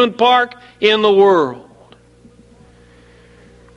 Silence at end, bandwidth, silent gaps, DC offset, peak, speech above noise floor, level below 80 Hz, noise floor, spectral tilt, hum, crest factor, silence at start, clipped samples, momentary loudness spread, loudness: 2.15 s; 7.8 kHz; none; under 0.1%; 0 dBFS; 33 dB; -54 dBFS; -46 dBFS; -5 dB/octave; 60 Hz at -55 dBFS; 16 dB; 0 s; under 0.1%; 12 LU; -13 LUFS